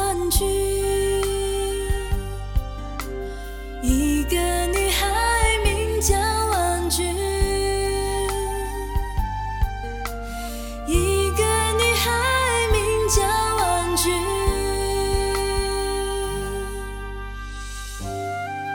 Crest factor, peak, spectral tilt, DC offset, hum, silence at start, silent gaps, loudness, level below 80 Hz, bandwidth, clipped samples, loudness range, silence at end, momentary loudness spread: 18 dB; -4 dBFS; -3.5 dB/octave; under 0.1%; none; 0 s; none; -22 LUFS; -28 dBFS; 17.5 kHz; under 0.1%; 6 LU; 0 s; 12 LU